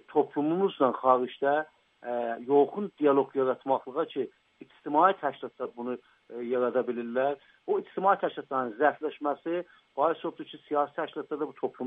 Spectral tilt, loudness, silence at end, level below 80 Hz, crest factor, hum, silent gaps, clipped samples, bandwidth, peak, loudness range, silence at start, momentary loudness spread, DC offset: -8.5 dB/octave; -29 LUFS; 0 s; -82 dBFS; 22 dB; none; none; under 0.1%; 3.9 kHz; -8 dBFS; 3 LU; 0.1 s; 13 LU; under 0.1%